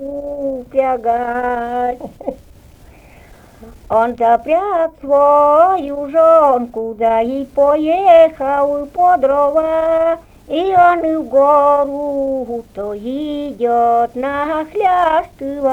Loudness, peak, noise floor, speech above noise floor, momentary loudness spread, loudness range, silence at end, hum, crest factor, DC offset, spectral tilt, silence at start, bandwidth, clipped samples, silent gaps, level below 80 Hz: -14 LUFS; 0 dBFS; -42 dBFS; 28 dB; 13 LU; 8 LU; 0 s; none; 14 dB; under 0.1%; -6.5 dB/octave; 0 s; 8.6 kHz; under 0.1%; none; -46 dBFS